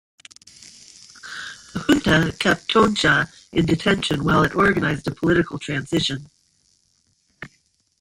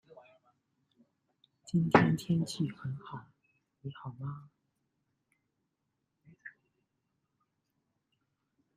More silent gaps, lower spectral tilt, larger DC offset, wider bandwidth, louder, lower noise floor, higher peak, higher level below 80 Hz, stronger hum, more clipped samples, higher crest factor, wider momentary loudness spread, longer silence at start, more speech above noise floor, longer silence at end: neither; second, -5 dB/octave vs -7 dB/octave; neither; first, 16 kHz vs 11.5 kHz; first, -20 LUFS vs -32 LUFS; second, -65 dBFS vs -83 dBFS; first, -2 dBFS vs -8 dBFS; first, -46 dBFS vs -68 dBFS; neither; neither; second, 20 dB vs 30 dB; second, 18 LU vs 26 LU; second, 1.25 s vs 1.75 s; second, 45 dB vs 52 dB; second, 0.55 s vs 2.25 s